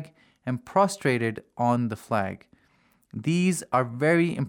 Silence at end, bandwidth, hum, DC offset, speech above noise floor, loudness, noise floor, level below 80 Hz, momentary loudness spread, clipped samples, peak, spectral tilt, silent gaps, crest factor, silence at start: 0 s; 17 kHz; none; under 0.1%; 39 dB; -26 LUFS; -64 dBFS; -68 dBFS; 13 LU; under 0.1%; -8 dBFS; -6 dB/octave; none; 18 dB; 0 s